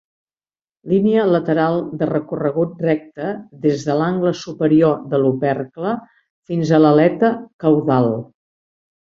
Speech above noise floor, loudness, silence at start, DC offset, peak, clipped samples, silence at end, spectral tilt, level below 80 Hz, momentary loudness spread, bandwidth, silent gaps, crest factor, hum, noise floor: over 73 dB; -18 LUFS; 0.85 s; under 0.1%; -2 dBFS; under 0.1%; 0.8 s; -8 dB/octave; -58 dBFS; 10 LU; 7.4 kHz; 6.30-6.43 s, 7.53-7.59 s; 16 dB; none; under -90 dBFS